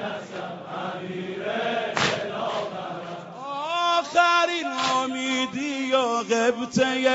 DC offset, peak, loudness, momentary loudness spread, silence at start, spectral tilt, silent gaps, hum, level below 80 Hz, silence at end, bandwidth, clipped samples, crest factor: under 0.1%; -4 dBFS; -25 LUFS; 13 LU; 0 s; -2 dB/octave; none; none; -66 dBFS; 0 s; 8 kHz; under 0.1%; 20 dB